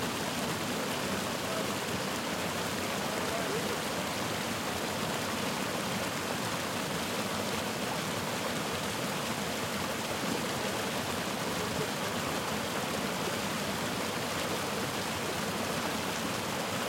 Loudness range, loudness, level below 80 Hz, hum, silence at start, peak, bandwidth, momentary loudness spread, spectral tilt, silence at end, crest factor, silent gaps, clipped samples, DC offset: 0 LU; -33 LUFS; -62 dBFS; none; 0 s; -18 dBFS; 16.5 kHz; 1 LU; -3 dB/octave; 0 s; 14 dB; none; under 0.1%; under 0.1%